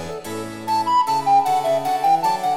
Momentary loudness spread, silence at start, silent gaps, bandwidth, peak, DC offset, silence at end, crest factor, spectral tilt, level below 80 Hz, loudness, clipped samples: 12 LU; 0 s; none; 16.5 kHz; -8 dBFS; under 0.1%; 0 s; 12 dB; -4 dB/octave; -58 dBFS; -19 LUFS; under 0.1%